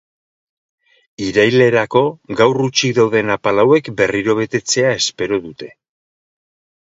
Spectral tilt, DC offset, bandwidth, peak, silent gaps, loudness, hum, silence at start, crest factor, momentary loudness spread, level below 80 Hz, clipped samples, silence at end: -4 dB/octave; under 0.1%; 7.8 kHz; 0 dBFS; none; -15 LUFS; none; 1.2 s; 16 dB; 8 LU; -54 dBFS; under 0.1%; 1.15 s